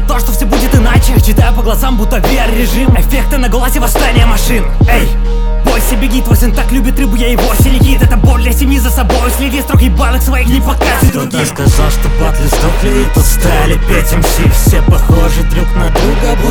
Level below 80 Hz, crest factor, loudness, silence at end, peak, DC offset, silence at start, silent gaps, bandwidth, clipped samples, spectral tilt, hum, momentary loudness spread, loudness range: -10 dBFS; 8 dB; -11 LUFS; 0 s; 0 dBFS; under 0.1%; 0 s; none; 19.5 kHz; 1%; -5 dB/octave; none; 4 LU; 1 LU